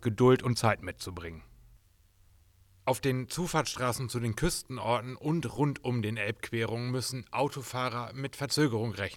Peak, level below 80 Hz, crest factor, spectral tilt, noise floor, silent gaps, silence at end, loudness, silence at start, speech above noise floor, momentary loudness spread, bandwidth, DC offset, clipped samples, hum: -12 dBFS; -54 dBFS; 20 dB; -5 dB/octave; -63 dBFS; none; 0 s; -31 LUFS; 0 s; 33 dB; 9 LU; 17.5 kHz; under 0.1%; under 0.1%; none